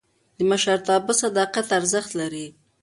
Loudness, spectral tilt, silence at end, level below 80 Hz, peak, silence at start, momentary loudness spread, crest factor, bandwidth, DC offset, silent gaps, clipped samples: -22 LUFS; -2.5 dB/octave; 0.35 s; -66 dBFS; -6 dBFS; 0.4 s; 10 LU; 16 dB; 11.5 kHz; under 0.1%; none; under 0.1%